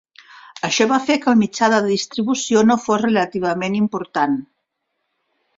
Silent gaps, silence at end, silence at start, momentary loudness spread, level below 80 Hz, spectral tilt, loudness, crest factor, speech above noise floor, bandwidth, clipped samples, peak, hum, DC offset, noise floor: none; 1.15 s; 0.55 s; 6 LU; -60 dBFS; -4.5 dB/octave; -18 LUFS; 16 dB; 57 dB; 7.8 kHz; under 0.1%; -2 dBFS; none; under 0.1%; -74 dBFS